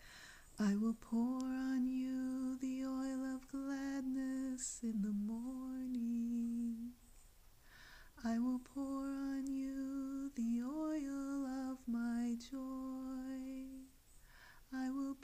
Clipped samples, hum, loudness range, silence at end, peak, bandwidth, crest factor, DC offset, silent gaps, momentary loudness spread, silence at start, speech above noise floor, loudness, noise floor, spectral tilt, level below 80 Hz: under 0.1%; none; 4 LU; 0 s; -26 dBFS; 15.5 kHz; 14 dB; under 0.1%; none; 12 LU; 0 s; 25 dB; -42 LUFS; -63 dBFS; -5.5 dB/octave; -66 dBFS